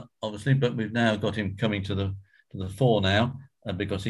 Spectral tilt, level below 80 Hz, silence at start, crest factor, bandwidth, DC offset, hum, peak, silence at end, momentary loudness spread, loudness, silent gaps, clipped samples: -6.5 dB/octave; -46 dBFS; 0 s; 18 dB; 12 kHz; under 0.1%; none; -10 dBFS; 0 s; 14 LU; -27 LUFS; none; under 0.1%